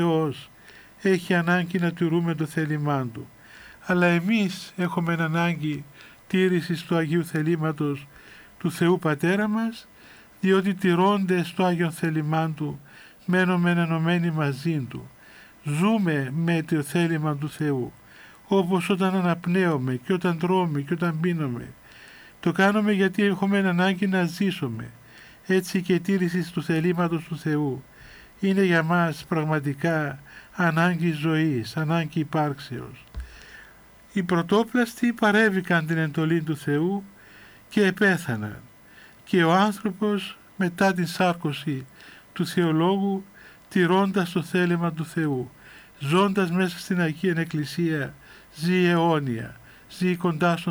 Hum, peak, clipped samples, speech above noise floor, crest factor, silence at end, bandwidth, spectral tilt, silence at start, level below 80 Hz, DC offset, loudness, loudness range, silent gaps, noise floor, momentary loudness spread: none; -6 dBFS; under 0.1%; 27 dB; 18 dB; 0 s; over 20 kHz; -6.5 dB/octave; 0 s; -58 dBFS; under 0.1%; -24 LUFS; 2 LU; none; -51 dBFS; 13 LU